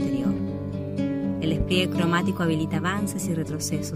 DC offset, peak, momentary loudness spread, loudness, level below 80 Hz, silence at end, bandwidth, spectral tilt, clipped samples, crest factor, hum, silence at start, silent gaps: under 0.1%; -8 dBFS; 6 LU; -26 LUFS; -42 dBFS; 0 s; 15.5 kHz; -5.5 dB/octave; under 0.1%; 18 dB; none; 0 s; none